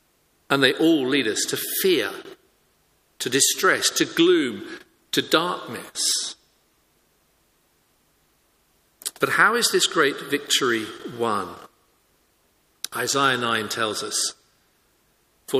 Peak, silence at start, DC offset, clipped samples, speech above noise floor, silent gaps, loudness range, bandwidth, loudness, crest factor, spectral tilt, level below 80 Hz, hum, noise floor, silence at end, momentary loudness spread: 0 dBFS; 0.5 s; under 0.1%; under 0.1%; 42 dB; none; 6 LU; 15.5 kHz; -21 LUFS; 24 dB; -2 dB/octave; -70 dBFS; none; -64 dBFS; 0 s; 14 LU